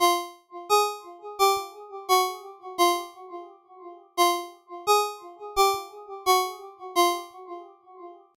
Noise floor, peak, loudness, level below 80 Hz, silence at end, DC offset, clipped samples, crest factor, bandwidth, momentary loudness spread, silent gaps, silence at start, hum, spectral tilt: -47 dBFS; -8 dBFS; -25 LUFS; -60 dBFS; 0.25 s; under 0.1%; under 0.1%; 18 dB; 17 kHz; 19 LU; none; 0 s; none; -0.5 dB/octave